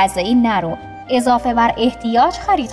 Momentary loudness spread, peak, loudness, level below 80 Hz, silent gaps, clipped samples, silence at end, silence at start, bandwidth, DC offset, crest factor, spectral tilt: 5 LU; -4 dBFS; -16 LUFS; -40 dBFS; none; under 0.1%; 0 s; 0 s; 11 kHz; under 0.1%; 12 dB; -5 dB/octave